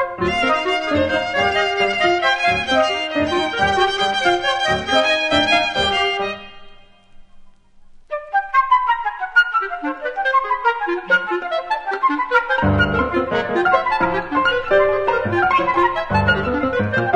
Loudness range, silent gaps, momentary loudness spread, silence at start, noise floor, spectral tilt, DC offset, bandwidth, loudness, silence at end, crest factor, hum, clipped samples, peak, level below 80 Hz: 3 LU; none; 6 LU; 0 s; -44 dBFS; -4.5 dB/octave; under 0.1%; 11 kHz; -18 LUFS; 0 s; 18 dB; none; under 0.1%; -2 dBFS; -42 dBFS